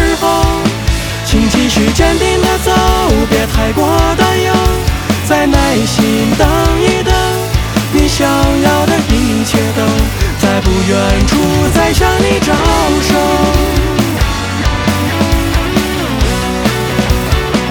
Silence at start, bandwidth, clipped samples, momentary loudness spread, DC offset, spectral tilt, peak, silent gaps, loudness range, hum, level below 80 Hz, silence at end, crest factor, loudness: 0 s; over 20 kHz; under 0.1%; 4 LU; under 0.1%; -5 dB/octave; 0 dBFS; none; 2 LU; none; -18 dBFS; 0 s; 10 dB; -11 LUFS